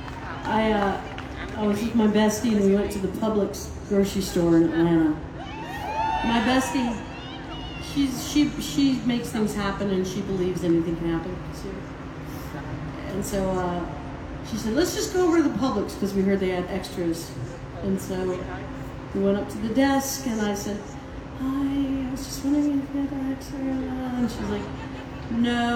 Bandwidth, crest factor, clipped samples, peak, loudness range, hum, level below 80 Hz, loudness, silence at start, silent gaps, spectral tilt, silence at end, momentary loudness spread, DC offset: 18 kHz; 16 dB; under 0.1%; -10 dBFS; 5 LU; none; -42 dBFS; -26 LUFS; 0 s; none; -5.5 dB/octave; 0 s; 14 LU; under 0.1%